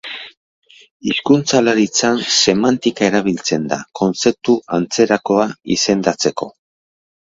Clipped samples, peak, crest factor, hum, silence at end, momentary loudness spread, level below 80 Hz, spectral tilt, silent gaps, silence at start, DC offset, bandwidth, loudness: under 0.1%; 0 dBFS; 16 dB; none; 0.7 s; 8 LU; -54 dBFS; -3.5 dB/octave; 0.37-0.62 s, 0.91-1.00 s; 0.05 s; under 0.1%; 8 kHz; -16 LUFS